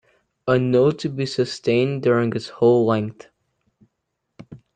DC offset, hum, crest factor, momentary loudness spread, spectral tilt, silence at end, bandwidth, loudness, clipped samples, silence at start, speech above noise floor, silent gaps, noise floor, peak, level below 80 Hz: under 0.1%; none; 16 dB; 8 LU; -7 dB/octave; 0.2 s; 9.2 kHz; -20 LUFS; under 0.1%; 0.45 s; 58 dB; none; -77 dBFS; -6 dBFS; -62 dBFS